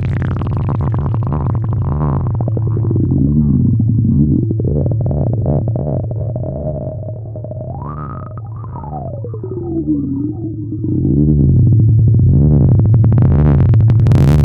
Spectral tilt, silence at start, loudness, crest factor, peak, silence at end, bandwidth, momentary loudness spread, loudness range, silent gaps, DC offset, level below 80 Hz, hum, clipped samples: -11 dB/octave; 0 s; -14 LUFS; 12 dB; 0 dBFS; 0 s; 4.2 kHz; 15 LU; 12 LU; none; under 0.1%; -24 dBFS; none; under 0.1%